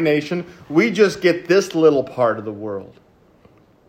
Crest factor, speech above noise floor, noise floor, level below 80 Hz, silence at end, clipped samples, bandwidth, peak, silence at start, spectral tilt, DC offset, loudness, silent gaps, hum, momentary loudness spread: 18 dB; 34 dB; -52 dBFS; -62 dBFS; 1.05 s; under 0.1%; 16 kHz; -2 dBFS; 0 s; -5.5 dB/octave; under 0.1%; -18 LUFS; none; none; 13 LU